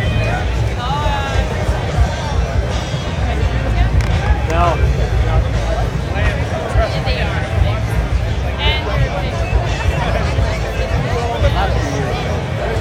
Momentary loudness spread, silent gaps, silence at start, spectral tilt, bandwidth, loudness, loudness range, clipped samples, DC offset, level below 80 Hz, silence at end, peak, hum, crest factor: 3 LU; none; 0 s; -6 dB/octave; 11.5 kHz; -18 LUFS; 1 LU; under 0.1%; under 0.1%; -20 dBFS; 0 s; -2 dBFS; none; 14 dB